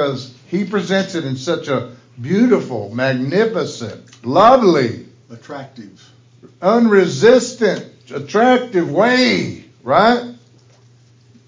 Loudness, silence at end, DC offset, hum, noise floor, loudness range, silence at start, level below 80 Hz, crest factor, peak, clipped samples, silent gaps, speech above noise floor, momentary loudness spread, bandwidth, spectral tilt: -15 LUFS; 1.15 s; under 0.1%; none; -49 dBFS; 4 LU; 0 s; -56 dBFS; 16 dB; 0 dBFS; under 0.1%; none; 34 dB; 20 LU; 7.6 kHz; -5.5 dB/octave